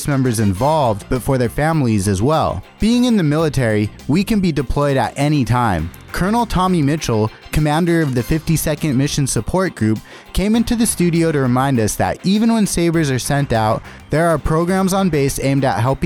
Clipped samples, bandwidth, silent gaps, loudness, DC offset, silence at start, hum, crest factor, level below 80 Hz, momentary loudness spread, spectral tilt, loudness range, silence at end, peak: under 0.1%; 18.5 kHz; none; -17 LUFS; under 0.1%; 0 s; none; 12 dB; -32 dBFS; 4 LU; -6 dB/octave; 1 LU; 0 s; -4 dBFS